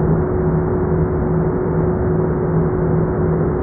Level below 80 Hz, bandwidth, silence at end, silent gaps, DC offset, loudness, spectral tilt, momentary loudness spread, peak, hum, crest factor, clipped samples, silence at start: -28 dBFS; 2.4 kHz; 0 s; none; under 0.1%; -18 LUFS; -14.5 dB/octave; 1 LU; -6 dBFS; none; 12 dB; under 0.1%; 0 s